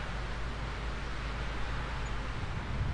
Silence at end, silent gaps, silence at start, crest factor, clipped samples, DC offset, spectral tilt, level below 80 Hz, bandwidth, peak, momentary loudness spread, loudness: 0 s; none; 0 s; 12 dB; under 0.1%; under 0.1%; -5.5 dB/octave; -38 dBFS; 10.5 kHz; -24 dBFS; 1 LU; -38 LUFS